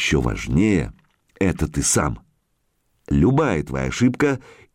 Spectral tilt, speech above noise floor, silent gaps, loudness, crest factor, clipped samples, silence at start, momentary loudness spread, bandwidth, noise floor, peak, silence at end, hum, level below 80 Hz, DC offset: -5 dB/octave; 49 dB; none; -20 LUFS; 14 dB; under 0.1%; 0 s; 8 LU; 16.5 kHz; -69 dBFS; -8 dBFS; 0.35 s; none; -34 dBFS; under 0.1%